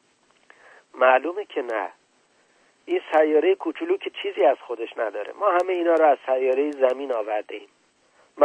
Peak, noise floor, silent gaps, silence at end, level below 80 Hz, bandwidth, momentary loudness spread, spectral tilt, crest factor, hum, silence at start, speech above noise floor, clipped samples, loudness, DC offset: -4 dBFS; -63 dBFS; none; 0 s; -84 dBFS; 9.2 kHz; 11 LU; -3.5 dB/octave; 18 dB; none; 0.95 s; 40 dB; under 0.1%; -23 LUFS; under 0.1%